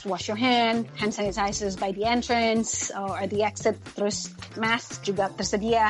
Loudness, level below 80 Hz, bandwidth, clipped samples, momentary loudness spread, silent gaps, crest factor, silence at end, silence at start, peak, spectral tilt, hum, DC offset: -26 LUFS; -50 dBFS; 11.5 kHz; under 0.1%; 7 LU; none; 18 dB; 0 s; 0 s; -8 dBFS; -3.5 dB/octave; none; under 0.1%